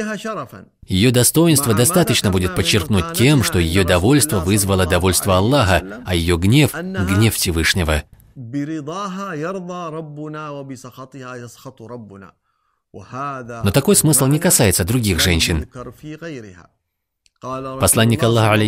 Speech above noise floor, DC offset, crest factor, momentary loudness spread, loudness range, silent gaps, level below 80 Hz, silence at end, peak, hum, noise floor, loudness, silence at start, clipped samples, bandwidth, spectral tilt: 51 dB; under 0.1%; 18 dB; 20 LU; 14 LU; none; -36 dBFS; 0 s; 0 dBFS; none; -68 dBFS; -16 LUFS; 0 s; under 0.1%; 16.5 kHz; -4.5 dB/octave